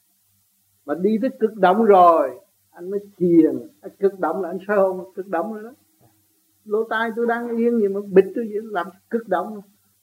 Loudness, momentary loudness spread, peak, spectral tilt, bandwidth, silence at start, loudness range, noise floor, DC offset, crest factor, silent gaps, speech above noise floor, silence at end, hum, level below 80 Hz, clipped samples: -20 LUFS; 16 LU; -2 dBFS; -8 dB/octave; 16 kHz; 0.85 s; 6 LU; -64 dBFS; under 0.1%; 18 dB; none; 44 dB; 0.4 s; none; -78 dBFS; under 0.1%